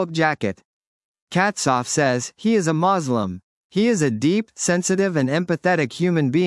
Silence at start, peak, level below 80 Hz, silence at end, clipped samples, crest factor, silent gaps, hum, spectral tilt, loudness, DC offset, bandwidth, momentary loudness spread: 0 s; -4 dBFS; -66 dBFS; 0 s; under 0.1%; 16 dB; 0.65-1.15 s, 1.22-1.27 s, 3.43-3.70 s; none; -5 dB/octave; -21 LUFS; under 0.1%; 12 kHz; 7 LU